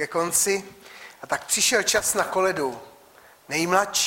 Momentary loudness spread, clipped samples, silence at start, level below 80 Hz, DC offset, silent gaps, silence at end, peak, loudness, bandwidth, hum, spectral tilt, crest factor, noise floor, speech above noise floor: 22 LU; under 0.1%; 0 s; -60 dBFS; under 0.1%; none; 0 s; -6 dBFS; -22 LUFS; 16.5 kHz; none; -1.5 dB/octave; 20 dB; -52 dBFS; 29 dB